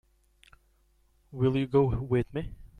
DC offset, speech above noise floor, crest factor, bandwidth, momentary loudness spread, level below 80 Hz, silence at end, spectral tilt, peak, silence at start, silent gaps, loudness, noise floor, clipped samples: under 0.1%; 39 dB; 20 dB; 9.6 kHz; 12 LU; -48 dBFS; 0.15 s; -9.5 dB/octave; -12 dBFS; 1.3 s; none; -28 LUFS; -67 dBFS; under 0.1%